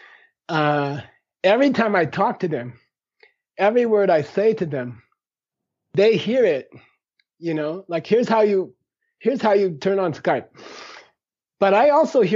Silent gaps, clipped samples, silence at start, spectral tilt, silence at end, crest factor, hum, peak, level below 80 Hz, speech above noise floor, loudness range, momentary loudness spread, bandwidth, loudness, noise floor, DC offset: none; under 0.1%; 0.5 s; -4.5 dB/octave; 0 s; 16 dB; none; -4 dBFS; -70 dBFS; 67 dB; 3 LU; 15 LU; 7.6 kHz; -20 LUFS; -87 dBFS; under 0.1%